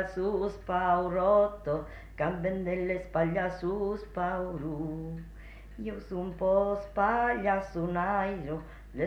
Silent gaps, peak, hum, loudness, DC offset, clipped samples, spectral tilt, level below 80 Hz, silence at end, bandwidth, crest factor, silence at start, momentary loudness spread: none; -14 dBFS; none; -31 LUFS; under 0.1%; under 0.1%; -8 dB/octave; -48 dBFS; 0 s; 9 kHz; 16 dB; 0 s; 13 LU